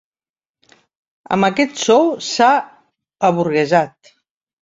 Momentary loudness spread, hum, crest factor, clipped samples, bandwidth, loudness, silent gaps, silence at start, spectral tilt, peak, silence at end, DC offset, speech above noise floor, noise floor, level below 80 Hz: 7 LU; none; 16 dB; under 0.1%; 7.8 kHz; -16 LUFS; none; 1.3 s; -4.5 dB/octave; -2 dBFS; 0.85 s; under 0.1%; over 75 dB; under -90 dBFS; -62 dBFS